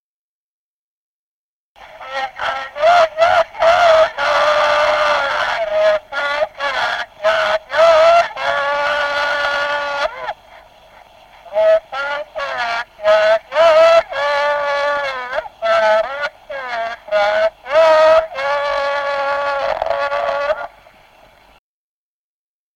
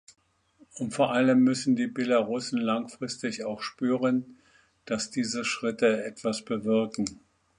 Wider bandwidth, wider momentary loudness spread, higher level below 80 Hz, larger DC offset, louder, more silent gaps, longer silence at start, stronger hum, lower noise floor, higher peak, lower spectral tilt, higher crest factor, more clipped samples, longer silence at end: about the same, 10.5 kHz vs 10.5 kHz; about the same, 12 LU vs 11 LU; first, -52 dBFS vs -68 dBFS; neither; first, -15 LUFS vs -28 LUFS; neither; first, 1.8 s vs 0.75 s; neither; first, under -90 dBFS vs -62 dBFS; first, -2 dBFS vs -10 dBFS; second, -1.5 dB/octave vs -4.5 dB/octave; about the same, 14 dB vs 18 dB; neither; first, 2.1 s vs 0.45 s